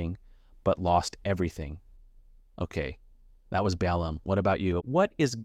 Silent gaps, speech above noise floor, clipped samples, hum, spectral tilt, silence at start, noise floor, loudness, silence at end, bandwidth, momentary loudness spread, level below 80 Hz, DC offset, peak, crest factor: none; 28 dB; under 0.1%; none; -6 dB/octave; 0 s; -55 dBFS; -29 LUFS; 0 s; 13 kHz; 12 LU; -46 dBFS; under 0.1%; -12 dBFS; 18 dB